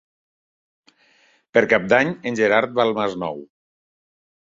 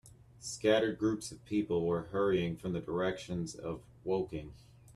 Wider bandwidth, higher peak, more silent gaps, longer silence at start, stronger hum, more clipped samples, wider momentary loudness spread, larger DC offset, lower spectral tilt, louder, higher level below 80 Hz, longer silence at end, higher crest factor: second, 7.6 kHz vs 13 kHz; first, -2 dBFS vs -16 dBFS; neither; first, 1.55 s vs 0.05 s; neither; neither; about the same, 12 LU vs 13 LU; neither; about the same, -5.5 dB/octave vs -5.5 dB/octave; first, -19 LUFS vs -34 LUFS; about the same, -62 dBFS vs -60 dBFS; first, 0.95 s vs 0.05 s; about the same, 22 dB vs 18 dB